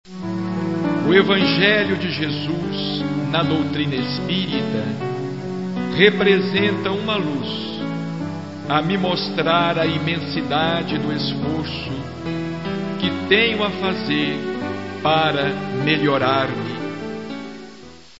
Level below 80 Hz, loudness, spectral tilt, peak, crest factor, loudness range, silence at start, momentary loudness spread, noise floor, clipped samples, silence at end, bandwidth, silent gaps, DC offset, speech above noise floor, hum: -52 dBFS; -20 LUFS; -6.5 dB/octave; -2 dBFS; 20 dB; 3 LU; 0.05 s; 12 LU; -42 dBFS; under 0.1%; 0.15 s; 8 kHz; none; 0.4%; 23 dB; none